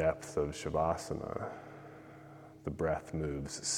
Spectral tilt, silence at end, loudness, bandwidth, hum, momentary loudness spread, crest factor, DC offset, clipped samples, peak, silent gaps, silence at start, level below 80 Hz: -4.5 dB/octave; 0 s; -37 LUFS; 16.5 kHz; none; 19 LU; 20 dB; under 0.1%; under 0.1%; -16 dBFS; none; 0 s; -54 dBFS